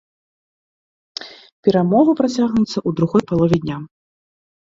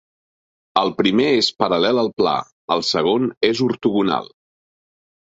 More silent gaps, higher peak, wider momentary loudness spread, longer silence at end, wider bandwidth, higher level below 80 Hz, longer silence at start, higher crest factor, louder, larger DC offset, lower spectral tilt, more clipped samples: second, 1.52-1.63 s vs 2.52-2.68 s, 3.37-3.41 s; about the same, -2 dBFS vs -2 dBFS; first, 18 LU vs 5 LU; second, 0.8 s vs 0.95 s; about the same, 7.8 kHz vs 8 kHz; first, -50 dBFS vs -58 dBFS; first, 1.2 s vs 0.75 s; about the same, 18 dB vs 18 dB; about the same, -17 LUFS vs -19 LUFS; neither; first, -7.5 dB/octave vs -5 dB/octave; neither